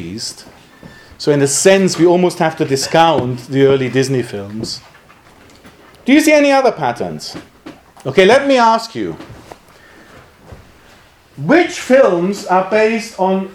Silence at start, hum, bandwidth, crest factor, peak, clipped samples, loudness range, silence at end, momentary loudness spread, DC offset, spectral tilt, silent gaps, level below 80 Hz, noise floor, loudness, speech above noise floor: 0 s; none; 15.5 kHz; 14 dB; 0 dBFS; under 0.1%; 4 LU; 0 s; 15 LU; under 0.1%; -4.5 dB/octave; none; -52 dBFS; -45 dBFS; -13 LUFS; 32 dB